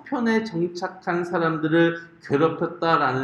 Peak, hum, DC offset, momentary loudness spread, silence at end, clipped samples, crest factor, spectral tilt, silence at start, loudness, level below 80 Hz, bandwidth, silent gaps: -6 dBFS; none; under 0.1%; 7 LU; 0 s; under 0.1%; 18 dB; -7 dB/octave; 0.05 s; -23 LUFS; -66 dBFS; 8 kHz; none